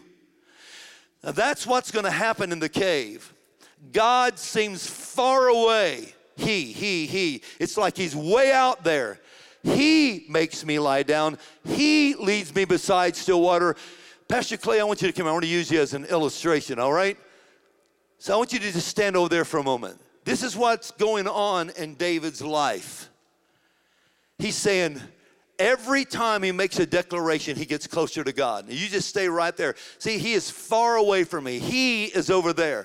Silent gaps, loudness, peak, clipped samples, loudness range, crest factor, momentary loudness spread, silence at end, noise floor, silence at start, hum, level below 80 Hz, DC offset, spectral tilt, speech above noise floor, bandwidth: none; -24 LUFS; -8 dBFS; under 0.1%; 4 LU; 18 dB; 10 LU; 0 s; -66 dBFS; 0.7 s; none; -60 dBFS; under 0.1%; -3.5 dB/octave; 43 dB; 16.5 kHz